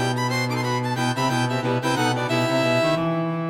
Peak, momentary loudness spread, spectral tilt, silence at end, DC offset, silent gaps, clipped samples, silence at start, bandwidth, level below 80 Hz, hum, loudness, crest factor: -8 dBFS; 4 LU; -5.5 dB/octave; 0 s; under 0.1%; none; under 0.1%; 0 s; 16 kHz; -58 dBFS; none; -22 LUFS; 14 dB